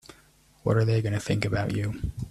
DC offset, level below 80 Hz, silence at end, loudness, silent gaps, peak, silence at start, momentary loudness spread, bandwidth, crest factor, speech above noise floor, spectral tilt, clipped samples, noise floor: under 0.1%; -44 dBFS; 0 s; -27 LUFS; none; -8 dBFS; 0.1 s; 9 LU; 12.5 kHz; 18 dB; 33 dB; -7 dB/octave; under 0.1%; -59 dBFS